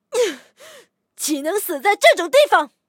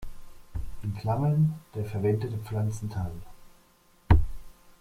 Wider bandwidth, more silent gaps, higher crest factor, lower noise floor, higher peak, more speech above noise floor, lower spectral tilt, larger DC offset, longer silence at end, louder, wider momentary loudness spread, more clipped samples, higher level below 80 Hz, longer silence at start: about the same, 17 kHz vs 15.5 kHz; neither; about the same, 18 dB vs 22 dB; second, -48 dBFS vs -61 dBFS; first, 0 dBFS vs -6 dBFS; about the same, 31 dB vs 32 dB; second, 0 dB/octave vs -8.5 dB/octave; neither; about the same, 0.2 s vs 0.3 s; first, -17 LUFS vs -29 LUFS; second, 10 LU vs 16 LU; neither; second, -78 dBFS vs -38 dBFS; about the same, 0.1 s vs 0 s